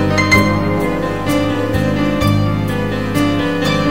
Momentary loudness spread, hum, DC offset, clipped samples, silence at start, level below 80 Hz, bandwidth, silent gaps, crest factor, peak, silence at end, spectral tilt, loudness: 6 LU; none; 2%; under 0.1%; 0 s; -32 dBFS; 16.5 kHz; none; 16 dB; 0 dBFS; 0 s; -6 dB/octave; -15 LUFS